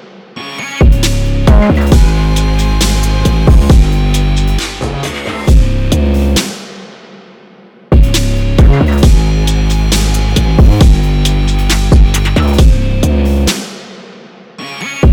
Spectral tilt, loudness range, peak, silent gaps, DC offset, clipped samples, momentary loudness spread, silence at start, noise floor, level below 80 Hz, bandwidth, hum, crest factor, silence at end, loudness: -5.5 dB/octave; 4 LU; 0 dBFS; none; under 0.1%; under 0.1%; 13 LU; 0.35 s; -39 dBFS; -10 dBFS; 17 kHz; none; 8 dB; 0 s; -11 LUFS